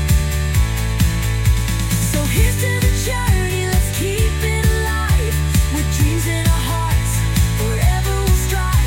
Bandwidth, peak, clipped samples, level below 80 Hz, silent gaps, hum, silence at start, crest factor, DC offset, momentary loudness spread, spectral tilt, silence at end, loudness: 17 kHz; -2 dBFS; under 0.1%; -20 dBFS; none; none; 0 s; 14 dB; under 0.1%; 2 LU; -4.5 dB/octave; 0 s; -18 LUFS